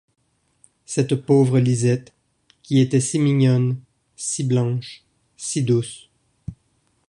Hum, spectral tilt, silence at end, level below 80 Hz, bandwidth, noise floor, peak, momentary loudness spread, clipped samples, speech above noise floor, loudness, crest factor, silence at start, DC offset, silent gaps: none; -6.5 dB/octave; 0.55 s; -56 dBFS; 11 kHz; -66 dBFS; -4 dBFS; 22 LU; under 0.1%; 47 dB; -20 LUFS; 16 dB; 0.9 s; under 0.1%; none